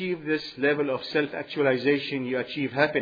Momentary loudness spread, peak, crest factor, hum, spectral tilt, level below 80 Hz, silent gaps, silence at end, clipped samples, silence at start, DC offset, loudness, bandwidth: 5 LU; -8 dBFS; 18 dB; none; -7 dB/octave; -68 dBFS; none; 0 s; under 0.1%; 0 s; under 0.1%; -26 LUFS; 5 kHz